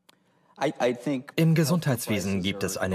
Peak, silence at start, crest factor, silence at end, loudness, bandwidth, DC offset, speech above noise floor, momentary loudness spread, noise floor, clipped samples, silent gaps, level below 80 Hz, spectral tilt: -10 dBFS; 0.6 s; 16 dB; 0 s; -26 LUFS; 15.5 kHz; under 0.1%; 37 dB; 8 LU; -62 dBFS; under 0.1%; none; -64 dBFS; -5.5 dB/octave